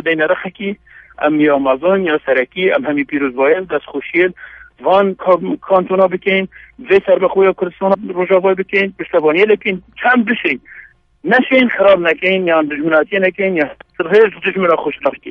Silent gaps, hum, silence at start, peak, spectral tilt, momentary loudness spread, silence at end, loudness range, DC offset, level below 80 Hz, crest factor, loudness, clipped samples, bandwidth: none; none; 0.05 s; 0 dBFS; -8 dB/octave; 8 LU; 0 s; 2 LU; under 0.1%; -54 dBFS; 14 dB; -14 LUFS; under 0.1%; 5.6 kHz